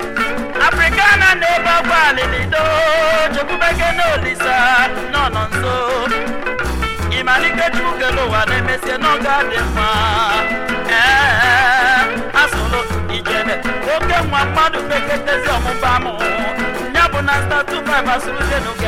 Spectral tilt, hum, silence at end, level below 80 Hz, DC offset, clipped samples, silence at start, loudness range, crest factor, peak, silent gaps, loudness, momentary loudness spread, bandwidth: -4 dB/octave; none; 0 s; -30 dBFS; under 0.1%; under 0.1%; 0 s; 4 LU; 14 dB; -2 dBFS; none; -14 LUFS; 8 LU; 16.5 kHz